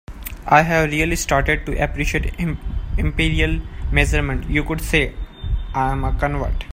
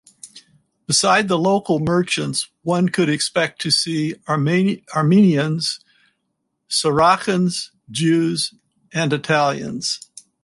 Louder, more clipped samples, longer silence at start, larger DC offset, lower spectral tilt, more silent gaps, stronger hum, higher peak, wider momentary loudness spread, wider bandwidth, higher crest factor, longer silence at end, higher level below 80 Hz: about the same, -20 LUFS vs -19 LUFS; neither; second, 0.1 s vs 0.25 s; neither; about the same, -5 dB/octave vs -4.5 dB/octave; neither; neither; about the same, 0 dBFS vs -2 dBFS; about the same, 11 LU vs 9 LU; first, 16 kHz vs 11.5 kHz; about the same, 20 dB vs 18 dB; second, 0 s vs 0.45 s; first, -24 dBFS vs -58 dBFS